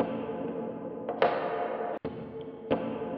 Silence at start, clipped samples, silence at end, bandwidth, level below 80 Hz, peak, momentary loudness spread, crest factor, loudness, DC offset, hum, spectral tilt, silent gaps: 0 s; under 0.1%; 0 s; 5.8 kHz; -66 dBFS; -8 dBFS; 11 LU; 24 dB; -33 LUFS; under 0.1%; none; -4.5 dB/octave; none